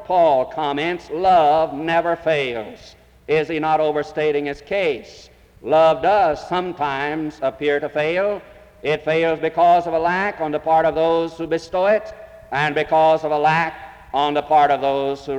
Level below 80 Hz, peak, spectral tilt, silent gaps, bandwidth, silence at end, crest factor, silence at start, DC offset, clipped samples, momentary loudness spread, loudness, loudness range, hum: -52 dBFS; -6 dBFS; -6 dB/octave; none; 9.4 kHz; 0 s; 12 dB; 0 s; under 0.1%; under 0.1%; 9 LU; -19 LUFS; 3 LU; none